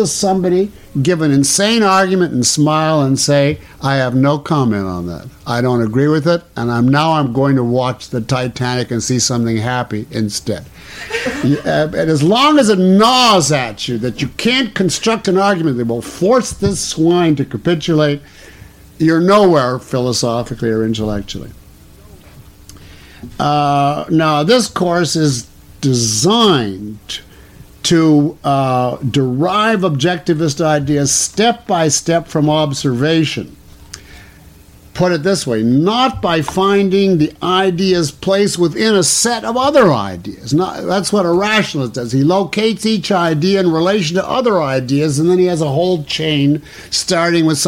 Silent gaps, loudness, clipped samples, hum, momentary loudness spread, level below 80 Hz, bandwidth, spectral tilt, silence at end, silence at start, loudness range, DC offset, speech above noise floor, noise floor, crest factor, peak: none; -14 LUFS; under 0.1%; none; 9 LU; -44 dBFS; 16.5 kHz; -4.5 dB/octave; 0 s; 0 s; 5 LU; under 0.1%; 27 dB; -41 dBFS; 12 dB; -2 dBFS